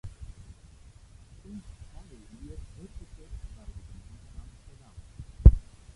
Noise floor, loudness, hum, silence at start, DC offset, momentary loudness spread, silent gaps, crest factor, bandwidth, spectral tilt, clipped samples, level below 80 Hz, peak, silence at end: -52 dBFS; -23 LUFS; none; 0.05 s; under 0.1%; 31 LU; none; 26 dB; 7.8 kHz; -9 dB/octave; under 0.1%; -30 dBFS; -2 dBFS; 0.35 s